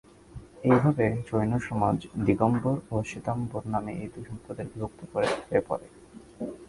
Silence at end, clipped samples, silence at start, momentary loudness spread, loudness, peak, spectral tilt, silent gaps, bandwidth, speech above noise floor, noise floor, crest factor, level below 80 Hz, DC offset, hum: 0.05 s; under 0.1%; 0.35 s; 15 LU; -28 LUFS; -6 dBFS; -8 dB/octave; none; 11.5 kHz; 19 dB; -47 dBFS; 22 dB; -52 dBFS; under 0.1%; none